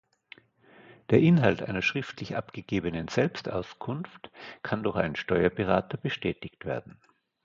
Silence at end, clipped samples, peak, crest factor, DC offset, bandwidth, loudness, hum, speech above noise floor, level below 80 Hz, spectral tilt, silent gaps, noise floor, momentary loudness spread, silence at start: 0.55 s; under 0.1%; -6 dBFS; 22 dB; under 0.1%; 7.4 kHz; -28 LUFS; none; 29 dB; -54 dBFS; -7 dB/octave; none; -58 dBFS; 14 LU; 0.9 s